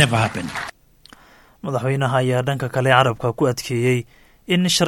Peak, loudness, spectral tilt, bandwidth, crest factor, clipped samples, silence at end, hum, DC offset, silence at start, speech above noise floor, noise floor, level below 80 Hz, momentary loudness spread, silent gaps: 0 dBFS; -20 LUFS; -5 dB/octave; 17 kHz; 20 dB; under 0.1%; 0 s; none; under 0.1%; 0 s; 30 dB; -49 dBFS; -52 dBFS; 13 LU; none